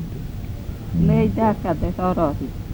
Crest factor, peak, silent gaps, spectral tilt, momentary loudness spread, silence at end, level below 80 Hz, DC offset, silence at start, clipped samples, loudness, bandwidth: 16 dB; -6 dBFS; none; -9 dB/octave; 14 LU; 0 s; -32 dBFS; under 0.1%; 0 s; under 0.1%; -22 LUFS; over 20 kHz